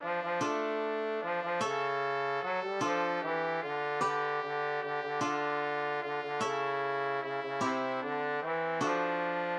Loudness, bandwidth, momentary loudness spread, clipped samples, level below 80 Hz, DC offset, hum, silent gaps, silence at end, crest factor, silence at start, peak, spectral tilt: -33 LUFS; 11.5 kHz; 3 LU; under 0.1%; -84 dBFS; under 0.1%; none; none; 0 s; 14 dB; 0 s; -20 dBFS; -4.5 dB/octave